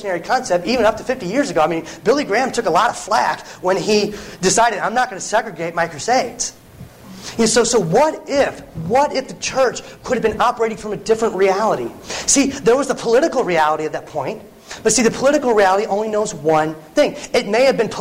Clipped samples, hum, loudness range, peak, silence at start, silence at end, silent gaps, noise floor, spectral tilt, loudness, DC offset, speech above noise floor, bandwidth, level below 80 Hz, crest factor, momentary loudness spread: under 0.1%; none; 2 LU; -2 dBFS; 0 s; 0 s; none; -39 dBFS; -3.5 dB/octave; -17 LUFS; under 0.1%; 22 dB; 16 kHz; -48 dBFS; 14 dB; 9 LU